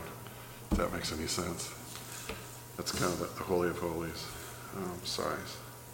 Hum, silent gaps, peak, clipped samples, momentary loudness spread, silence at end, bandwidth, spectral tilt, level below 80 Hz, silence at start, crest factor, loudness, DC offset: none; none; -16 dBFS; under 0.1%; 12 LU; 0 s; 17 kHz; -4 dB/octave; -50 dBFS; 0 s; 22 dB; -37 LUFS; under 0.1%